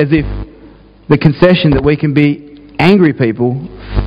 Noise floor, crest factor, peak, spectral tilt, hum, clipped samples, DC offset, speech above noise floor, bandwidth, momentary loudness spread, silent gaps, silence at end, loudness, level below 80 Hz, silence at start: -39 dBFS; 12 dB; 0 dBFS; -9 dB/octave; none; 0.6%; under 0.1%; 29 dB; 5.6 kHz; 15 LU; none; 0 s; -11 LUFS; -26 dBFS; 0 s